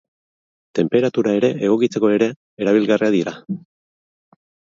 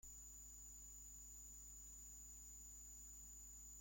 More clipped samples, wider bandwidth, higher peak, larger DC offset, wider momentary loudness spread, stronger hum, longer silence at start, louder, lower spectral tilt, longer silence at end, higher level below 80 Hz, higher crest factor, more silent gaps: neither; second, 7.6 kHz vs 16.5 kHz; first, -2 dBFS vs -48 dBFS; neither; first, 10 LU vs 0 LU; second, none vs 50 Hz at -65 dBFS; first, 0.75 s vs 0.05 s; first, -18 LUFS vs -56 LUFS; first, -6.5 dB/octave vs -2 dB/octave; first, 1.2 s vs 0 s; about the same, -64 dBFS vs -66 dBFS; first, 18 dB vs 10 dB; first, 2.36-2.57 s vs none